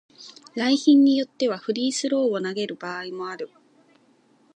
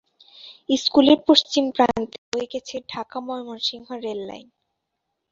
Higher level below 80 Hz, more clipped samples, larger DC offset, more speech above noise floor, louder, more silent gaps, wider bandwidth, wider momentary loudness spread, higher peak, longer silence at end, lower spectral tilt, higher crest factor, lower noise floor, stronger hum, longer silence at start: second, -82 dBFS vs -60 dBFS; neither; neither; second, 37 dB vs 57 dB; about the same, -23 LUFS vs -21 LUFS; second, none vs 2.18-2.32 s; first, 9.6 kHz vs 7.8 kHz; first, 19 LU vs 16 LU; second, -6 dBFS vs -2 dBFS; first, 1.1 s vs 0.9 s; about the same, -4 dB/octave vs -3.5 dB/octave; about the same, 18 dB vs 22 dB; second, -60 dBFS vs -79 dBFS; neither; second, 0.2 s vs 0.45 s